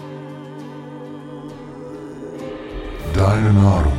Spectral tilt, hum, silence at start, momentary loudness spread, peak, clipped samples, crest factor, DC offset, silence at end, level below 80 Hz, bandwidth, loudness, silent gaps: -8 dB/octave; none; 0 s; 20 LU; -4 dBFS; under 0.1%; 16 dB; under 0.1%; 0 s; -30 dBFS; 10.5 kHz; -18 LUFS; none